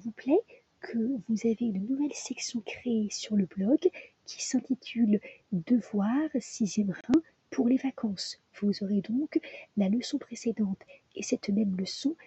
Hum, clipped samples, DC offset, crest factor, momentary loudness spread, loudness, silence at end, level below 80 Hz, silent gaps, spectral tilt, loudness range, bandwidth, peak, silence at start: none; under 0.1%; under 0.1%; 18 dB; 9 LU; -30 LUFS; 0.1 s; -72 dBFS; none; -5.5 dB/octave; 2 LU; 8.4 kHz; -12 dBFS; 0.05 s